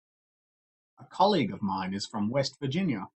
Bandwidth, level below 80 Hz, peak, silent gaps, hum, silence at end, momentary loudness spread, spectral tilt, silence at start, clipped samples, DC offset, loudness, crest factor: 8.6 kHz; -68 dBFS; -10 dBFS; none; none; 0.1 s; 8 LU; -6 dB/octave; 1 s; under 0.1%; under 0.1%; -29 LUFS; 20 dB